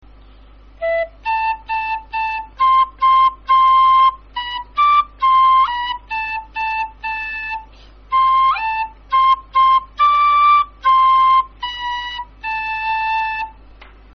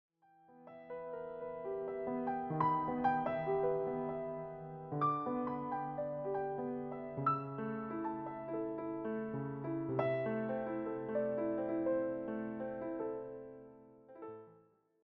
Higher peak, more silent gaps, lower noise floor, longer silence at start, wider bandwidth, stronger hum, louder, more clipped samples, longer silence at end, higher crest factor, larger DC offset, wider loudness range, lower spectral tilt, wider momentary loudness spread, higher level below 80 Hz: first, -6 dBFS vs -20 dBFS; neither; second, -43 dBFS vs -68 dBFS; first, 0.8 s vs 0.5 s; first, 6.2 kHz vs 5.4 kHz; neither; first, -16 LUFS vs -39 LUFS; neither; second, 0.3 s vs 0.5 s; second, 12 dB vs 20 dB; neither; about the same, 5 LU vs 3 LU; second, 2 dB/octave vs -7.5 dB/octave; about the same, 13 LU vs 13 LU; first, -44 dBFS vs -72 dBFS